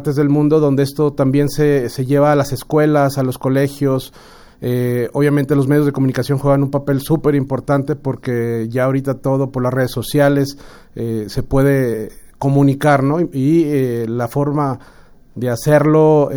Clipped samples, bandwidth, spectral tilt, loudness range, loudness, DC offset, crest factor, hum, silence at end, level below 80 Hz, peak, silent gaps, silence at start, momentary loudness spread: under 0.1%; over 20 kHz; -7.5 dB/octave; 3 LU; -16 LUFS; under 0.1%; 16 dB; none; 0 s; -40 dBFS; 0 dBFS; none; 0 s; 9 LU